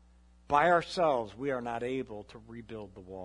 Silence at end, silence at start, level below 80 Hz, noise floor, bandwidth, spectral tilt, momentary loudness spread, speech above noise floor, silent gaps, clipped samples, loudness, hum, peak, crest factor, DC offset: 0 s; 0.5 s; -60 dBFS; -60 dBFS; 11 kHz; -5.5 dB/octave; 20 LU; 29 dB; none; under 0.1%; -30 LUFS; none; -12 dBFS; 20 dB; under 0.1%